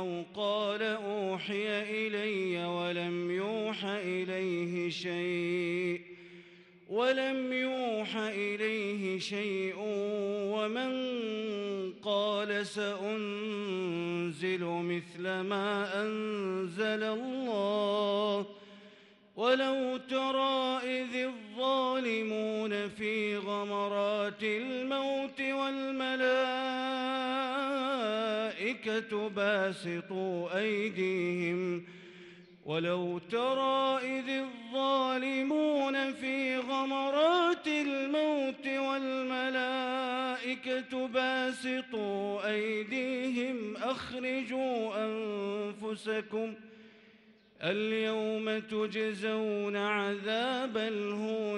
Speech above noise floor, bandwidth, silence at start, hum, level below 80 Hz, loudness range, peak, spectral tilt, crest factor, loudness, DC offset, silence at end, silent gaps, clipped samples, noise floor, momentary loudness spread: 29 dB; 11.5 kHz; 0 s; none; -80 dBFS; 4 LU; -16 dBFS; -5 dB/octave; 18 dB; -33 LUFS; under 0.1%; 0 s; none; under 0.1%; -61 dBFS; 6 LU